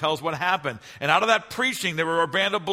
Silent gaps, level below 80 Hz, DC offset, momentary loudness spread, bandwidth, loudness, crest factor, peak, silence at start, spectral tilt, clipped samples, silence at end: none; -64 dBFS; under 0.1%; 6 LU; 16 kHz; -23 LUFS; 20 dB; -4 dBFS; 0 s; -3.5 dB/octave; under 0.1%; 0 s